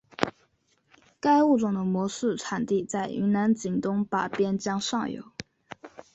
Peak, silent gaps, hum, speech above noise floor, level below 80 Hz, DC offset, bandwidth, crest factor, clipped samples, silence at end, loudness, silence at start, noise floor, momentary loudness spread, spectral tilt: -2 dBFS; none; none; 43 dB; -66 dBFS; under 0.1%; 8.2 kHz; 26 dB; under 0.1%; 0.1 s; -27 LUFS; 0.2 s; -68 dBFS; 20 LU; -5.5 dB/octave